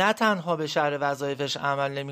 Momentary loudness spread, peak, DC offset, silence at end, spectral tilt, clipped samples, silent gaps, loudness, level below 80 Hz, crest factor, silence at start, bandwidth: 5 LU; -8 dBFS; under 0.1%; 0 s; -4.5 dB/octave; under 0.1%; none; -26 LUFS; -72 dBFS; 18 dB; 0 s; 15.5 kHz